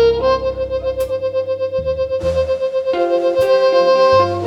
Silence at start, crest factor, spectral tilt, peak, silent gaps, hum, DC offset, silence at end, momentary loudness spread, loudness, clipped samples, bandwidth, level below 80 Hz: 0 s; 12 dB; -6 dB/octave; -2 dBFS; none; none; under 0.1%; 0 s; 8 LU; -16 LUFS; under 0.1%; 12 kHz; -38 dBFS